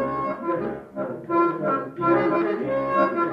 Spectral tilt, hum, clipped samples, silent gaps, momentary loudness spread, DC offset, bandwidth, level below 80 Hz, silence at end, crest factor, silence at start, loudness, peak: -9 dB/octave; none; under 0.1%; none; 10 LU; under 0.1%; 5.4 kHz; -58 dBFS; 0 s; 14 dB; 0 s; -24 LUFS; -10 dBFS